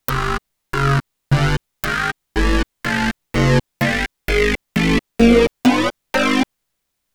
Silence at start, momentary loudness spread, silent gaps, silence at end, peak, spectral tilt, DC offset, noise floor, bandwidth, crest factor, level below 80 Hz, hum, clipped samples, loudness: 0.1 s; 8 LU; none; 0.7 s; 0 dBFS; -5.5 dB/octave; under 0.1%; -75 dBFS; over 20 kHz; 18 dB; -28 dBFS; none; under 0.1%; -18 LUFS